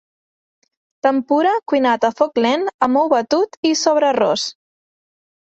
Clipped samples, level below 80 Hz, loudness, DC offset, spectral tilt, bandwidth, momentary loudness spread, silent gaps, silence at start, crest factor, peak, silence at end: under 0.1%; -64 dBFS; -17 LUFS; under 0.1%; -3 dB/octave; 8.2 kHz; 4 LU; 2.74-2.79 s, 3.57-3.63 s; 1.05 s; 16 dB; -2 dBFS; 1.05 s